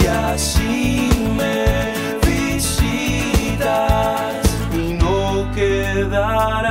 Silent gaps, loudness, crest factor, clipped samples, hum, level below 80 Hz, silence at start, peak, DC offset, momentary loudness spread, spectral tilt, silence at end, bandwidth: none; -18 LUFS; 14 dB; under 0.1%; none; -24 dBFS; 0 s; -4 dBFS; under 0.1%; 2 LU; -5 dB/octave; 0 s; 16.5 kHz